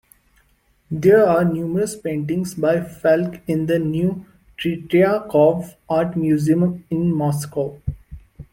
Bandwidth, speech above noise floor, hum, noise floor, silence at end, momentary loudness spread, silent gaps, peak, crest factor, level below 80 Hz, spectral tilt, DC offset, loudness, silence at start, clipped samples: 16.5 kHz; 42 dB; none; -60 dBFS; 0.1 s; 11 LU; none; -2 dBFS; 16 dB; -46 dBFS; -7.5 dB/octave; under 0.1%; -19 LUFS; 0.9 s; under 0.1%